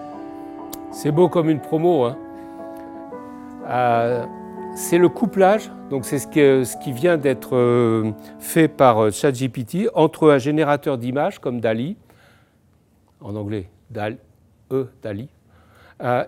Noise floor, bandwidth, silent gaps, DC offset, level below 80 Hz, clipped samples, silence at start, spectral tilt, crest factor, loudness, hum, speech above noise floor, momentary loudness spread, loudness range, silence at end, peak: -58 dBFS; 17 kHz; none; under 0.1%; -62 dBFS; under 0.1%; 0 s; -6.5 dB/octave; 20 dB; -19 LUFS; none; 39 dB; 19 LU; 12 LU; 0 s; 0 dBFS